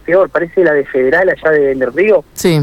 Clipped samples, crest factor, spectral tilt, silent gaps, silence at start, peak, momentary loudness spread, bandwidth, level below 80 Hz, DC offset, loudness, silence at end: under 0.1%; 10 dB; -6 dB/octave; none; 0.05 s; -2 dBFS; 3 LU; 17 kHz; -44 dBFS; under 0.1%; -12 LUFS; 0 s